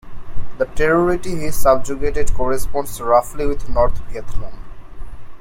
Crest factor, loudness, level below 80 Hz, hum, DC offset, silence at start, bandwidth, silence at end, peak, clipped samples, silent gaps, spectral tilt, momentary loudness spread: 14 dB; -19 LUFS; -26 dBFS; none; under 0.1%; 0.05 s; 16.5 kHz; 0 s; 0 dBFS; under 0.1%; none; -5.5 dB/octave; 21 LU